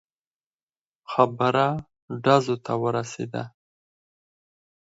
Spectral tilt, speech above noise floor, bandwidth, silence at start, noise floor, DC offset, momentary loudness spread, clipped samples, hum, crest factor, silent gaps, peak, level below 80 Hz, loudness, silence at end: -6 dB/octave; over 67 dB; 8 kHz; 1.1 s; under -90 dBFS; under 0.1%; 14 LU; under 0.1%; none; 24 dB; 2.02-2.08 s; -2 dBFS; -64 dBFS; -24 LUFS; 1.35 s